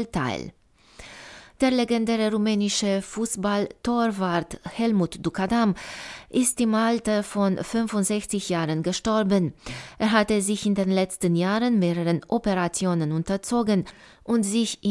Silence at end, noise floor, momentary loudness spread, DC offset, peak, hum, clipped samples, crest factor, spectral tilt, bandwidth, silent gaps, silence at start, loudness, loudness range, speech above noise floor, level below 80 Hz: 0 s; -48 dBFS; 10 LU; under 0.1%; -8 dBFS; none; under 0.1%; 16 dB; -5 dB/octave; 12 kHz; none; 0 s; -24 LUFS; 2 LU; 24 dB; -52 dBFS